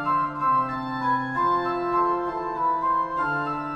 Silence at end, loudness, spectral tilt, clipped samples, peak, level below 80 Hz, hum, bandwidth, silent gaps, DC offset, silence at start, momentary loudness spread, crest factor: 0 s; -24 LUFS; -7.5 dB/octave; under 0.1%; -12 dBFS; -54 dBFS; none; 6.8 kHz; none; under 0.1%; 0 s; 4 LU; 12 dB